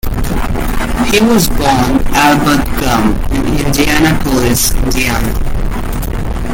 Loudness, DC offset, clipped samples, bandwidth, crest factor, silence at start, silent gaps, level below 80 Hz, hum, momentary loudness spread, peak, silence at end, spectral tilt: -12 LUFS; under 0.1%; under 0.1%; 17 kHz; 10 dB; 0.05 s; none; -18 dBFS; none; 10 LU; 0 dBFS; 0 s; -4.5 dB/octave